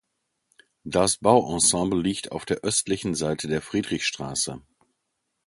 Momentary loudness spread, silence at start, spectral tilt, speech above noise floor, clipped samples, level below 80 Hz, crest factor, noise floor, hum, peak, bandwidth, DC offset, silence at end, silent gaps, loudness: 10 LU; 0.85 s; -3.5 dB/octave; 54 dB; under 0.1%; -52 dBFS; 22 dB; -78 dBFS; none; -4 dBFS; 12 kHz; under 0.1%; 0.9 s; none; -24 LUFS